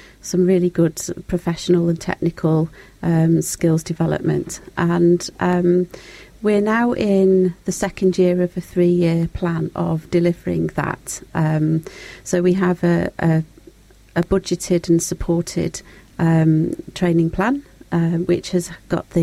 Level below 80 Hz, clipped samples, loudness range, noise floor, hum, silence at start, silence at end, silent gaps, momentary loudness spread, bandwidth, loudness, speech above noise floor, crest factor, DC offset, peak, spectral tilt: -42 dBFS; under 0.1%; 3 LU; -47 dBFS; none; 0.25 s; 0 s; none; 8 LU; 14.5 kHz; -19 LUFS; 28 dB; 14 dB; under 0.1%; -4 dBFS; -6.5 dB/octave